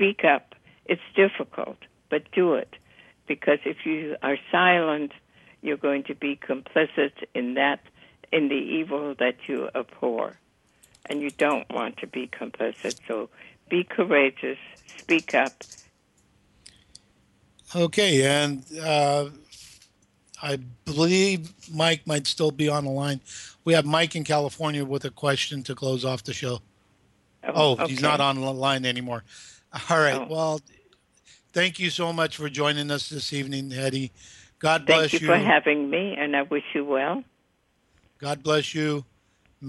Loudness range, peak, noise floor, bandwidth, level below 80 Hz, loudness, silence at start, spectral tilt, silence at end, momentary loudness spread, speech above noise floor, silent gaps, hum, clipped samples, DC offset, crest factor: 6 LU; -4 dBFS; -68 dBFS; 12.5 kHz; -66 dBFS; -25 LUFS; 0 s; -4.5 dB/octave; 0 s; 13 LU; 43 dB; none; none; under 0.1%; under 0.1%; 22 dB